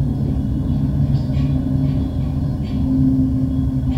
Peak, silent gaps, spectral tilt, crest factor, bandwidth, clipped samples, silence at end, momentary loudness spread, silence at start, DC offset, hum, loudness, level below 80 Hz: -6 dBFS; none; -10 dB/octave; 12 dB; 5.8 kHz; under 0.1%; 0 s; 5 LU; 0 s; under 0.1%; none; -19 LUFS; -26 dBFS